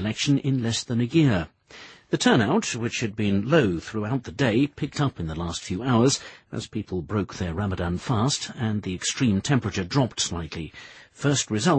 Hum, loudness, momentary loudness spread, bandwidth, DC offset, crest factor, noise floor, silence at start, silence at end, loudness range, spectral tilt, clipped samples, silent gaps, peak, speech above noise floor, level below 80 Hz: none; -25 LUFS; 12 LU; 8.8 kHz; under 0.1%; 20 dB; -47 dBFS; 0 s; 0 s; 3 LU; -5 dB/octave; under 0.1%; none; -4 dBFS; 23 dB; -48 dBFS